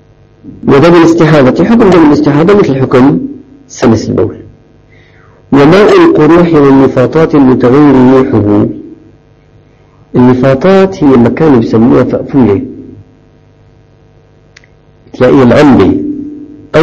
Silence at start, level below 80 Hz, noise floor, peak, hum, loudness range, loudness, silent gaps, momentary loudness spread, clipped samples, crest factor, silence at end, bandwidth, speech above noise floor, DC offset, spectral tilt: 0.45 s; -34 dBFS; -41 dBFS; 0 dBFS; 50 Hz at -35 dBFS; 6 LU; -5 LUFS; none; 10 LU; 5%; 6 dB; 0 s; 8.2 kHz; 37 dB; under 0.1%; -7.5 dB/octave